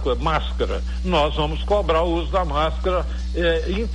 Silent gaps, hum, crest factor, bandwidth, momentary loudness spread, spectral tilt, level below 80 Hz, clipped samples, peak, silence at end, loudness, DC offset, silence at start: none; none; 12 dB; 9.2 kHz; 5 LU; -6.5 dB/octave; -26 dBFS; under 0.1%; -8 dBFS; 0 s; -22 LUFS; under 0.1%; 0 s